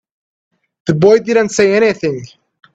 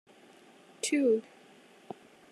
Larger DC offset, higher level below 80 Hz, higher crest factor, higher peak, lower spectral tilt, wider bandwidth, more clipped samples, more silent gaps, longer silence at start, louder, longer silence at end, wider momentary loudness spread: neither; first, -54 dBFS vs under -90 dBFS; about the same, 14 dB vs 16 dB; first, 0 dBFS vs -18 dBFS; first, -5.5 dB/octave vs -3 dB/octave; second, 8.4 kHz vs 13 kHz; neither; neither; about the same, 0.85 s vs 0.85 s; first, -13 LUFS vs -30 LUFS; second, 0.5 s vs 1.1 s; second, 12 LU vs 22 LU